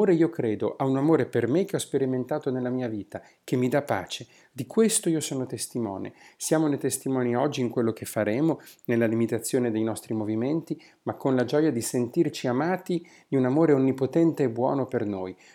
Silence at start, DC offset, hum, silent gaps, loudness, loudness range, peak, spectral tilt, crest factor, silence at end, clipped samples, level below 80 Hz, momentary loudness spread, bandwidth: 0 s; under 0.1%; none; none; -26 LUFS; 3 LU; -10 dBFS; -5.5 dB/octave; 16 dB; 0.2 s; under 0.1%; -74 dBFS; 11 LU; 17.5 kHz